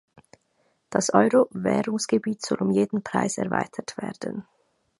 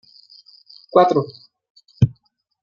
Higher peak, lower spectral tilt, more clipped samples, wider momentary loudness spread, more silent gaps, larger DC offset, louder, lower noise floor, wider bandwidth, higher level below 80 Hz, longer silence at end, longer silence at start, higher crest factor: about the same, -2 dBFS vs -2 dBFS; second, -5 dB/octave vs -8.5 dB/octave; neither; first, 13 LU vs 7 LU; second, none vs 1.70-1.75 s; neither; second, -25 LUFS vs -18 LUFS; first, -69 dBFS vs -62 dBFS; first, 11.5 kHz vs 7.2 kHz; second, -66 dBFS vs -48 dBFS; about the same, 0.6 s vs 0.5 s; about the same, 0.9 s vs 0.95 s; about the same, 24 dB vs 20 dB